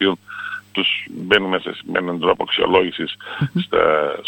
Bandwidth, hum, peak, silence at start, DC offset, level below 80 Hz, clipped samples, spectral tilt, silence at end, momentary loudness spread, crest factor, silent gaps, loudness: 17 kHz; none; 0 dBFS; 0 s; under 0.1%; -54 dBFS; under 0.1%; -6.5 dB/octave; 0 s; 11 LU; 20 dB; none; -19 LUFS